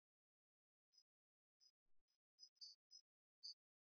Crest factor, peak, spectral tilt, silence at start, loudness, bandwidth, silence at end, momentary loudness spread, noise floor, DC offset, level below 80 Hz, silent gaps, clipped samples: 24 dB; -44 dBFS; 3.5 dB/octave; 0.95 s; -61 LUFS; 5.4 kHz; 0.35 s; 8 LU; under -90 dBFS; under 0.1%; under -90 dBFS; 1.02-1.60 s, 1.70-1.86 s, 2.01-2.08 s, 2.16-2.38 s, 2.49-2.56 s, 2.75-2.90 s, 3.01-3.42 s; under 0.1%